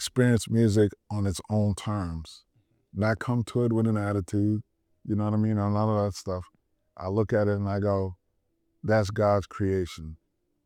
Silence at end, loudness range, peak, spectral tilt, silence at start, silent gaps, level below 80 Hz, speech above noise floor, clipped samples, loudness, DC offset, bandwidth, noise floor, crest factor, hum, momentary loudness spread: 0.5 s; 2 LU; -10 dBFS; -7 dB/octave; 0 s; none; -52 dBFS; 49 dB; under 0.1%; -27 LUFS; under 0.1%; 13.5 kHz; -75 dBFS; 18 dB; none; 12 LU